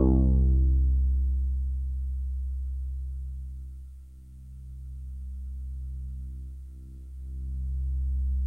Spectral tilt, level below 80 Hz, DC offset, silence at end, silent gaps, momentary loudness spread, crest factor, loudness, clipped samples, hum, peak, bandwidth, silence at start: -12 dB/octave; -28 dBFS; 0.1%; 0 s; none; 21 LU; 18 dB; -30 LUFS; under 0.1%; none; -10 dBFS; 1.2 kHz; 0 s